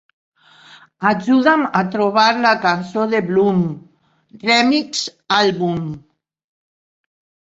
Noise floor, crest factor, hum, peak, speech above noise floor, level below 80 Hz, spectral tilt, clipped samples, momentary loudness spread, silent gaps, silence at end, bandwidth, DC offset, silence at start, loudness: -46 dBFS; 16 dB; none; -2 dBFS; 30 dB; -60 dBFS; -5 dB/octave; under 0.1%; 11 LU; none; 1.4 s; 8 kHz; under 0.1%; 1 s; -16 LUFS